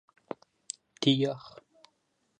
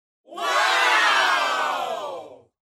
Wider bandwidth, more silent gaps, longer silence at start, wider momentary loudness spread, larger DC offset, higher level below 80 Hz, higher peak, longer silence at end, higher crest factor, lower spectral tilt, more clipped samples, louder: second, 9.6 kHz vs 16 kHz; neither; first, 1 s vs 0.3 s; about the same, 19 LU vs 17 LU; neither; about the same, -80 dBFS vs -80 dBFS; second, -12 dBFS vs -8 dBFS; first, 0.9 s vs 0.45 s; first, 22 dB vs 16 dB; first, -5 dB/octave vs 1 dB/octave; neither; second, -28 LUFS vs -20 LUFS